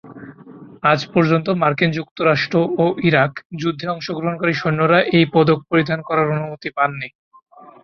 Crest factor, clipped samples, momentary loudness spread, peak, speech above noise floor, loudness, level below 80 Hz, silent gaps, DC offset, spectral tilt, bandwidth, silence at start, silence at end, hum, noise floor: 16 dB; under 0.1%; 9 LU; -2 dBFS; 23 dB; -18 LUFS; -56 dBFS; 2.11-2.16 s, 3.45-3.50 s, 7.15-7.31 s; under 0.1%; -7.5 dB/octave; 6.8 kHz; 0.05 s; 0.15 s; none; -40 dBFS